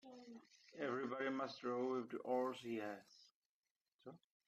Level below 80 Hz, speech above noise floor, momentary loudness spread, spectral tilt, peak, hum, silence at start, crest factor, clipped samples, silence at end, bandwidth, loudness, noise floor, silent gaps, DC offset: under -90 dBFS; over 46 dB; 19 LU; -5.5 dB/octave; -28 dBFS; none; 0.05 s; 18 dB; under 0.1%; 0.3 s; 13 kHz; -44 LUFS; under -90 dBFS; 3.35-3.63 s, 3.71-3.85 s, 3.94-3.99 s; under 0.1%